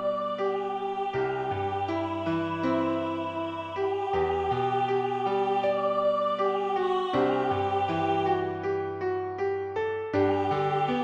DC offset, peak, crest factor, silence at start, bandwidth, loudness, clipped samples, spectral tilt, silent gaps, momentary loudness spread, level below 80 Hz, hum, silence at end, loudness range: under 0.1%; -14 dBFS; 14 dB; 0 s; 7.6 kHz; -28 LUFS; under 0.1%; -7.5 dB/octave; none; 5 LU; -60 dBFS; none; 0 s; 3 LU